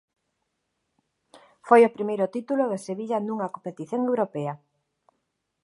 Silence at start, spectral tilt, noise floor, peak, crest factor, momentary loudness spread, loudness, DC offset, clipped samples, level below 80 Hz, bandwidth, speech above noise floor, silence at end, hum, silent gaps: 1.35 s; -7 dB/octave; -78 dBFS; -4 dBFS; 24 dB; 15 LU; -25 LUFS; under 0.1%; under 0.1%; -82 dBFS; 11.5 kHz; 54 dB; 1.05 s; none; none